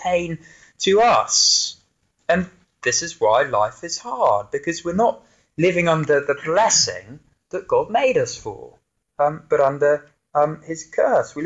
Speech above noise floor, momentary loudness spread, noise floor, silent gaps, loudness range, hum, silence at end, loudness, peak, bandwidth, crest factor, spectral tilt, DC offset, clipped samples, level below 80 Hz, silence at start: 45 dB; 17 LU; -65 dBFS; none; 3 LU; none; 0 s; -19 LUFS; -4 dBFS; 8.2 kHz; 16 dB; -2.5 dB/octave; under 0.1%; under 0.1%; -56 dBFS; 0 s